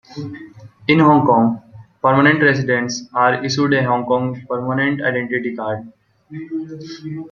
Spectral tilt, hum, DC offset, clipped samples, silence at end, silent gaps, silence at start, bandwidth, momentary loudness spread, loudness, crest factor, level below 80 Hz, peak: -6 dB/octave; none; under 0.1%; under 0.1%; 0.05 s; none; 0.1 s; 7.2 kHz; 19 LU; -17 LUFS; 16 dB; -58 dBFS; -2 dBFS